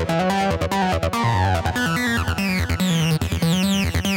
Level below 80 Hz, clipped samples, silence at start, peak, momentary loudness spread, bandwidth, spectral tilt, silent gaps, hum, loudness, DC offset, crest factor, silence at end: -34 dBFS; under 0.1%; 0 s; -10 dBFS; 2 LU; 17 kHz; -5 dB/octave; none; none; -20 LUFS; under 0.1%; 10 dB; 0 s